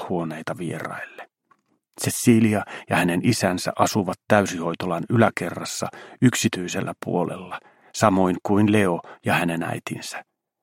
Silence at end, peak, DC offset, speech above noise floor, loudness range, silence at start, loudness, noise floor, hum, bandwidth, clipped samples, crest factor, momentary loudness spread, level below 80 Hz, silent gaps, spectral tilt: 0.4 s; -2 dBFS; under 0.1%; 42 dB; 3 LU; 0 s; -23 LUFS; -64 dBFS; none; 16.5 kHz; under 0.1%; 22 dB; 14 LU; -62 dBFS; none; -5 dB/octave